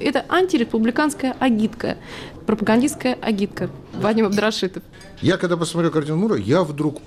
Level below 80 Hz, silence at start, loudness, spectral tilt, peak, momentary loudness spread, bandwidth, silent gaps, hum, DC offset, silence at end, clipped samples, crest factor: -50 dBFS; 0 s; -20 LUFS; -5.5 dB/octave; -8 dBFS; 9 LU; 14.5 kHz; none; none; under 0.1%; 0 s; under 0.1%; 12 dB